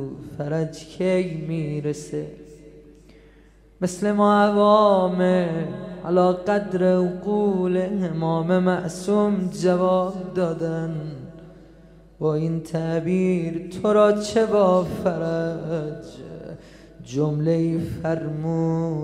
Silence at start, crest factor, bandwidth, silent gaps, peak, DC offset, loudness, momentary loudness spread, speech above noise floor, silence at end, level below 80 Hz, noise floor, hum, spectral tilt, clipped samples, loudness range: 0 s; 18 dB; 12 kHz; none; -4 dBFS; under 0.1%; -22 LUFS; 14 LU; 30 dB; 0 s; -52 dBFS; -51 dBFS; none; -7 dB/octave; under 0.1%; 7 LU